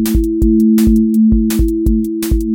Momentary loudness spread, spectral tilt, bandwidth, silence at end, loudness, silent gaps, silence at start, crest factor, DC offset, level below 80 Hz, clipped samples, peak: 6 LU; -7 dB/octave; 17 kHz; 0 s; -13 LUFS; none; 0 s; 10 dB; under 0.1%; -18 dBFS; under 0.1%; -2 dBFS